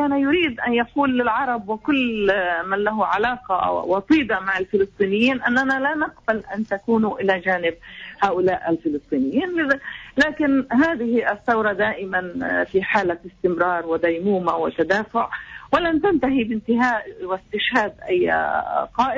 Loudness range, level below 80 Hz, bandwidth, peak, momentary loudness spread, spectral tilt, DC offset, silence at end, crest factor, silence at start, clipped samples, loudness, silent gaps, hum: 2 LU; -52 dBFS; 7.8 kHz; -6 dBFS; 6 LU; -6 dB/octave; under 0.1%; 0 s; 14 dB; 0 s; under 0.1%; -21 LUFS; none; none